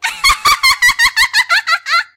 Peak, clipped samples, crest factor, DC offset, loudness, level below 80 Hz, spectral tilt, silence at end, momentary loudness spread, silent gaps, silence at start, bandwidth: -2 dBFS; under 0.1%; 12 dB; under 0.1%; -10 LUFS; -38 dBFS; 2 dB/octave; 0.1 s; 4 LU; none; 0 s; 17 kHz